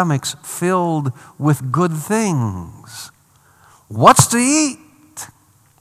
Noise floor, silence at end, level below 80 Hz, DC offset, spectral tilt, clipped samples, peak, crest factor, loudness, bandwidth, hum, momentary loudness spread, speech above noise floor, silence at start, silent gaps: -54 dBFS; 0.55 s; -54 dBFS; under 0.1%; -4.5 dB/octave; 0.2%; 0 dBFS; 18 dB; -16 LUFS; 17.5 kHz; none; 23 LU; 37 dB; 0 s; none